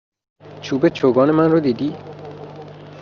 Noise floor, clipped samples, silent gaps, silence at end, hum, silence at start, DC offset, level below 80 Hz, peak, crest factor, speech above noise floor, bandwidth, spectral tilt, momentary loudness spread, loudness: -37 dBFS; under 0.1%; none; 0 s; 50 Hz at -45 dBFS; 0.45 s; under 0.1%; -60 dBFS; -2 dBFS; 16 dB; 21 dB; 7 kHz; -6.5 dB/octave; 21 LU; -17 LUFS